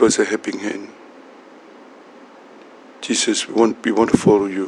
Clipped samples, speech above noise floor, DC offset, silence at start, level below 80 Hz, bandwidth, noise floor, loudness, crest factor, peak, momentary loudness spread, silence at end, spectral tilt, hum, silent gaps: under 0.1%; 26 dB; under 0.1%; 0 s; -56 dBFS; 11.5 kHz; -43 dBFS; -18 LUFS; 20 dB; 0 dBFS; 15 LU; 0 s; -4 dB/octave; none; none